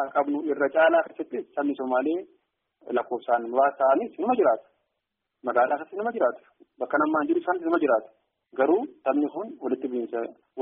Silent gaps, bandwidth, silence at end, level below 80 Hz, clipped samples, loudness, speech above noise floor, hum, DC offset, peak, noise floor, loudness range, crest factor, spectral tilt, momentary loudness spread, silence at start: none; 3.8 kHz; 0 s; -76 dBFS; under 0.1%; -25 LUFS; 57 dB; none; under 0.1%; -10 dBFS; -82 dBFS; 1 LU; 16 dB; -3.5 dB/octave; 11 LU; 0 s